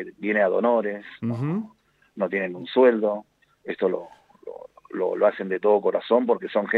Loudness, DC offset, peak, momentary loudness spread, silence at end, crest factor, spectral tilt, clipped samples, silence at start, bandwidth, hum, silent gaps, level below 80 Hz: -24 LUFS; under 0.1%; -6 dBFS; 21 LU; 0 s; 18 dB; -8.5 dB/octave; under 0.1%; 0 s; 4.8 kHz; none; none; -74 dBFS